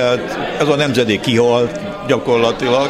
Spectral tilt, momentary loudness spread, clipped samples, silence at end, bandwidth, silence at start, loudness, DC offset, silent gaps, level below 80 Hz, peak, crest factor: -5 dB/octave; 6 LU; under 0.1%; 0 s; 14 kHz; 0 s; -15 LUFS; under 0.1%; none; -46 dBFS; 0 dBFS; 14 dB